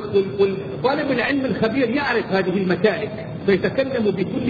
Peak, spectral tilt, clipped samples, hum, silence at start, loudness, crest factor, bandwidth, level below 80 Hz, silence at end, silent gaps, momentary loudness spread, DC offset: -4 dBFS; -8.5 dB/octave; under 0.1%; none; 0 s; -21 LUFS; 16 dB; 6.8 kHz; -50 dBFS; 0 s; none; 3 LU; under 0.1%